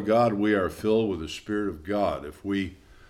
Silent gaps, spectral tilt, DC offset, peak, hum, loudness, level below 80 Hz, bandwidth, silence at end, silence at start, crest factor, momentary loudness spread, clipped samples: none; -6.5 dB/octave; under 0.1%; -10 dBFS; none; -27 LUFS; -50 dBFS; 14.5 kHz; 0.35 s; 0 s; 16 dB; 9 LU; under 0.1%